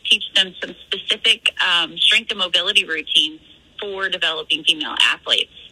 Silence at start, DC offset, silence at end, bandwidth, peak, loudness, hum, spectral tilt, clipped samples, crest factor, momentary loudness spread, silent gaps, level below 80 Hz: 0.05 s; under 0.1%; 0.05 s; 15.5 kHz; 0 dBFS; -17 LUFS; none; 0 dB/octave; under 0.1%; 20 dB; 10 LU; none; -60 dBFS